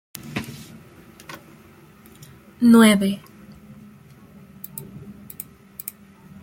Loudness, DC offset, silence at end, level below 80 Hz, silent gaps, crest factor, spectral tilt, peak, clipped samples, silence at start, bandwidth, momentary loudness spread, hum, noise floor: -18 LUFS; under 0.1%; 1.3 s; -60 dBFS; none; 22 dB; -5 dB/octave; -2 dBFS; under 0.1%; 0.25 s; 17 kHz; 28 LU; none; -49 dBFS